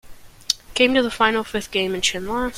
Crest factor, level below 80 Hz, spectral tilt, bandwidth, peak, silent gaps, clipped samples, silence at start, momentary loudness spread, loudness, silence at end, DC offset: 22 dB; -44 dBFS; -2.5 dB/octave; 16.5 kHz; 0 dBFS; none; under 0.1%; 0.05 s; 7 LU; -20 LUFS; 0 s; under 0.1%